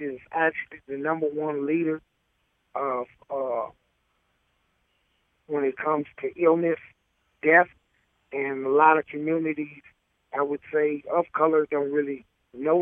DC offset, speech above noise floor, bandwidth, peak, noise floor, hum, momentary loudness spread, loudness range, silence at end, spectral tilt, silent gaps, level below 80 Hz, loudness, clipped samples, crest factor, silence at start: under 0.1%; 47 dB; 3.6 kHz; -4 dBFS; -72 dBFS; none; 14 LU; 9 LU; 0 s; -9.5 dB/octave; none; -72 dBFS; -25 LUFS; under 0.1%; 22 dB; 0 s